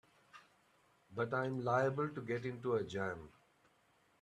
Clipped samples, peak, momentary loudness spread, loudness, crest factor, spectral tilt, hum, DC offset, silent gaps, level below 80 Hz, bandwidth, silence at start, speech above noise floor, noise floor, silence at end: under 0.1%; -20 dBFS; 8 LU; -38 LUFS; 20 dB; -7 dB/octave; none; under 0.1%; none; -74 dBFS; 10.5 kHz; 0.35 s; 35 dB; -73 dBFS; 0.9 s